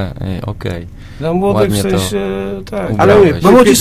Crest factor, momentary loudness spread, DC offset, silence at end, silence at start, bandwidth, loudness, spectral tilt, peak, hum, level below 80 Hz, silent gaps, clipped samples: 12 dB; 15 LU; under 0.1%; 0 s; 0 s; 16 kHz; -12 LUFS; -5.5 dB/octave; 0 dBFS; none; -32 dBFS; none; 0.3%